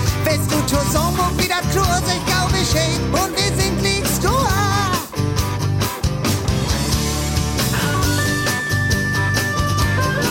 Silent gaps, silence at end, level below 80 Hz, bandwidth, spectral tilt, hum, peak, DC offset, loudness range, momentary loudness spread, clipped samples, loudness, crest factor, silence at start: none; 0 s; -30 dBFS; 17 kHz; -4 dB/octave; none; -6 dBFS; under 0.1%; 2 LU; 3 LU; under 0.1%; -18 LUFS; 12 dB; 0 s